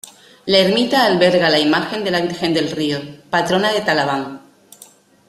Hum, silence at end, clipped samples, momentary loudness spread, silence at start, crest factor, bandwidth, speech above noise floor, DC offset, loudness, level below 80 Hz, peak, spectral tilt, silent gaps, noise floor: none; 0.9 s; under 0.1%; 9 LU; 0.45 s; 16 dB; 15 kHz; 30 dB; under 0.1%; -16 LUFS; -56 dBFS; 0 dBFS; -4.5 dB/octave; none; -47 dBFS